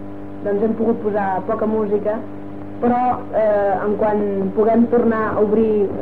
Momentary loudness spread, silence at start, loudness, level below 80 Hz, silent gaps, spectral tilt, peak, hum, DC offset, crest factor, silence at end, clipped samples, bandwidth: 9 LU; 0 s; -18 LUFS; -48 dBFS; none; -10 dB/octave; -6 dBFS; none; 2%; 12 dB; 0 s; under 0.1%; 4.4 kHz